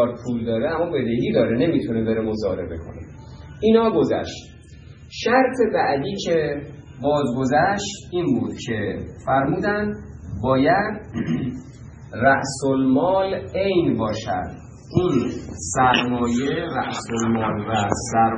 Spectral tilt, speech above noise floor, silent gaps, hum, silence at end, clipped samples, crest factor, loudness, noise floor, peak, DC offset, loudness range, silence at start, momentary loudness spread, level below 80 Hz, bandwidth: -5.5 dB/octave; 21 dB; none; none; 0 s; under 0.1%; 20 dB; -21 LUFS; -42 dBFS; -2 dBFS; under 0.1%; 2 LU; 0 s; 14 LU; -46 dBFS; 10.5 kHz